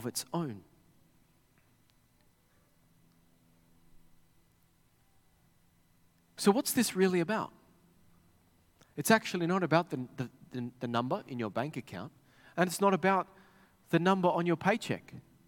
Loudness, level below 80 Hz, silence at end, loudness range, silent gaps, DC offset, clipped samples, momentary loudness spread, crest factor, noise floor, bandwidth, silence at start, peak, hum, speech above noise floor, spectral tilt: -31 LUFS; -72 dBFS; 0.25 s; 5 LU; none; under 0.1%; under 0.1%; 16 LU; 24 dB; -68 dBFS; 17.5 kHz; 0 s; -10 dBFS; none; 37 dB; -5 dB/octave